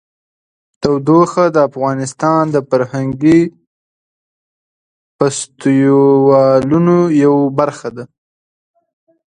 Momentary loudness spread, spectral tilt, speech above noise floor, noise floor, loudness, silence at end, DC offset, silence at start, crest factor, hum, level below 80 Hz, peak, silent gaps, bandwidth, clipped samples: 9 LU; -7 dB/octave; over 78 dB; under -90 dBFS; -12 LUFS; 1.3 s; under 0.1%; 0.8 s; 14 dB; none; -52 dBFS; 0 dBFS; 3.67-5.19 s; 10 kHz; under 0.1%